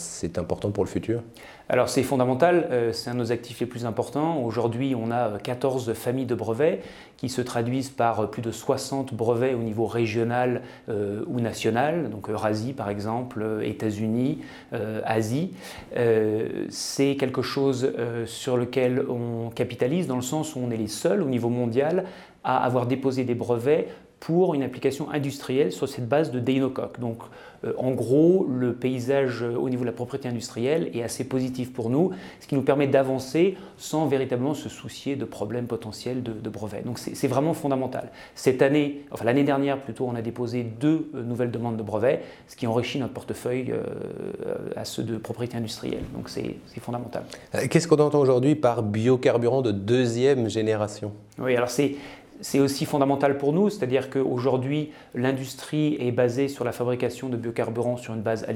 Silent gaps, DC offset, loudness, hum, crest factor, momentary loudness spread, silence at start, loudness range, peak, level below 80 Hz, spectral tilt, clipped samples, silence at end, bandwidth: none; under 0.1%; -26 LUFS; none; 20 dB; 11 LU; 0 s; 5 LU; -4 dBFS; -60 dBFS; -6 dB/octave; under 0.1%; 0 s; 17 kHz